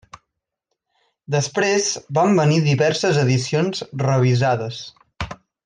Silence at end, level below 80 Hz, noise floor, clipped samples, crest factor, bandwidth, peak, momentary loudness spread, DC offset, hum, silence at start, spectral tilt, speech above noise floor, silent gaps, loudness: 0.3 s; -52 dBFS; -79 dBFS; under 0.1%; 14 dB; 9.8 kHz; -6 dBFS; 15 LU; under 0.1%; none; 1.3 s; -5.5 dB/octave; 60 dB; none; -19 LUFS